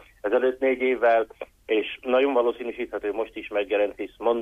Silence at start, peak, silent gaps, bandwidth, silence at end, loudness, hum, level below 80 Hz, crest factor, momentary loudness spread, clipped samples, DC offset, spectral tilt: 0.25 s; -10 dBFS; none; 5.4 kHz; 0 s; -25 LUFS; none; -60 dBFS; 14 dB; 10 LU; under 0.1%; under 0.1%; -5 dB/octave